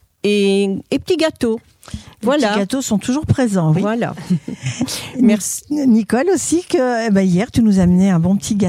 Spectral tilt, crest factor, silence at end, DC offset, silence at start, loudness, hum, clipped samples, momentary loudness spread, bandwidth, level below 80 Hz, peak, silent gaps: -5.5 dB/octave; 14 dB; 0 s; under 0.1%; 0.25 s; -16 LUFS; none; under 0.1%; 8 LU; 15.5 kHz; -42 dBFS; -2 dBFS; none